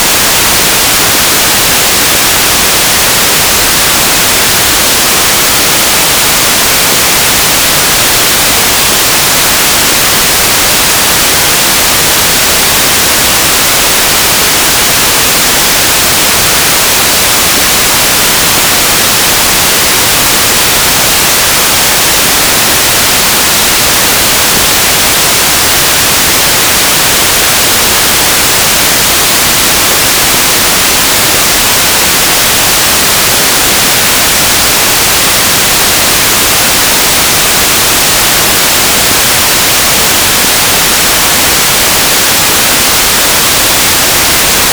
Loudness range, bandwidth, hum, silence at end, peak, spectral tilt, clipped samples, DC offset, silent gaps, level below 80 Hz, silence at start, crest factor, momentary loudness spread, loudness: 0 LU; over 20 kHz; none; 0 s; 0 dBFS; -0.5 dB/octave; 9%; under 0.1%; none; -28 dBFS; 0 s; 6 dB; 0 LU; -4 LUFS